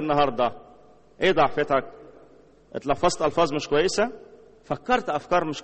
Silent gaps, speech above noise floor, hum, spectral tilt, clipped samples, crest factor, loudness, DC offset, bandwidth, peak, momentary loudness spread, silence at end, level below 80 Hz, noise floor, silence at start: none; 30 dB; none; -4.5 dB/octave; under 0.1%; 20 dB; -24 LUFS; under 0.1%; 8.4 kHz; -6 dBFS; 11 LU; 0 s; -48 dBFS; -54 dBFS; 0 s